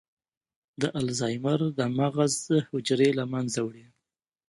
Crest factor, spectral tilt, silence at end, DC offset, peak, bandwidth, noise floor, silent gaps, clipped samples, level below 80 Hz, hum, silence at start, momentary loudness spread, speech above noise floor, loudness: 18 dB; -5 dB/octave; 0.7 s; under 0.1%; -10 dBFS; 11.5 kHz; -87 dBFS; none; under 0.1%; -66 dBFS; none; 0.8 s; 7 LU; 60 dB; -27 LUFS